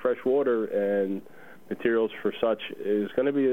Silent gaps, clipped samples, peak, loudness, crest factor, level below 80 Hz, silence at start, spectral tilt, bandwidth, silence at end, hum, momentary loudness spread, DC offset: none; under 0.1%; -10 dBFS; -27 LUFS; 16 dB; -70 dBFS; 0 s; -7.5 dB/octave; 16 kHz; 0 s; none; 6 LU; 0.3%